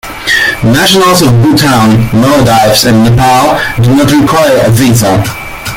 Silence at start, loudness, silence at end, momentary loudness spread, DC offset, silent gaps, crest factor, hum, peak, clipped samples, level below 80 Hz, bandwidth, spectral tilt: 0.05 s; -6 LUFS; 0 s; 4 LU; under 0.1%; none; 6 dB; none; 0 dBFS; 0.2%; -28 dBFS; 17 kHz; -5 dB/octave